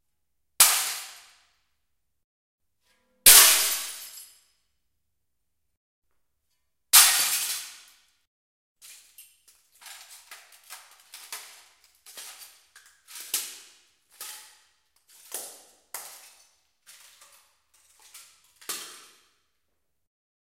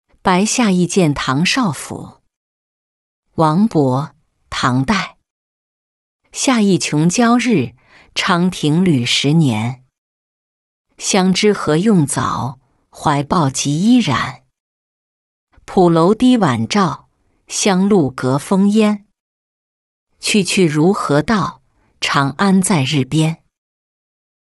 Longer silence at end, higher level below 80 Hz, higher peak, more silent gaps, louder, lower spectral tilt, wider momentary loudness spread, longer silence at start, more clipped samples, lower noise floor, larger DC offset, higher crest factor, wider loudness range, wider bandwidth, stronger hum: first, 1.55 s vs 1.1 s; second, -62 dBFS vs -48 dBFS; about the same, 0 dBFS vs -2 dBFS; second, 2.24-2.58 s, 5.77-6.02 s, 8.27-8.76 s vs 2.36-3.23 s, 5.30-6.19 s, 9.98-10.85 s, 14.60-15.47 s, 19.20-20.07 s; second, -18 LUFS vs -15 LUFS; second, 3 dB/octave vs -5 dB/octave; first, 29 LU vs 11 LU; first, 0.6 s vs 0.25 s; neither; second, -82 dBFS vs under -90 dBFS; neither; first, 30 dB vs 14 dB; first, 24 LU vs 4 LU; first, 16 kHz vs 12 kHz; neither